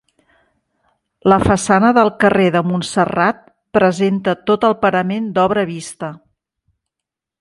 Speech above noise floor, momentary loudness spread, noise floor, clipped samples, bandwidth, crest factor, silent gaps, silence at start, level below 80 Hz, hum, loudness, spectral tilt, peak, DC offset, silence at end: 69 dB; 10 LU; -84 dBFS; under 0.1%; 11.5 kHz; 16 dB; none; 1.25 s; -44 dBFS; none; -15 LUFS; -5.5 dB/octave; 0 dBFS; under 0.1%; 1.25 s